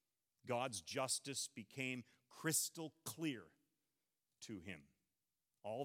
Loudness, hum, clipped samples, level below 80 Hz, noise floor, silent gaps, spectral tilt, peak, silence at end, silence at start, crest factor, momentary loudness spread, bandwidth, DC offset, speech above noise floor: -44 LUFS; none; under 0.1%; under -90 dBFS; under -90 dBFS; none; -3 dB/octave; -24 dBFS; 0 s; 0.45 s; 22 dB; 16 LU; 16.5 kHz; under 0.1%; over 45 dB